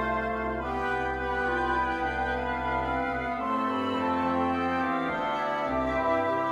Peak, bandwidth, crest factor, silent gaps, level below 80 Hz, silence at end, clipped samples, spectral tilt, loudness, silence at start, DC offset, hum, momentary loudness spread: -16 dBFS; 11.5 kHz; 14 dB; none; -44 dBFS; 0 s; under 0.1%; -6.5 dB/octave; -28 LUFS; 0 s; under 0.1%; none; 3 LU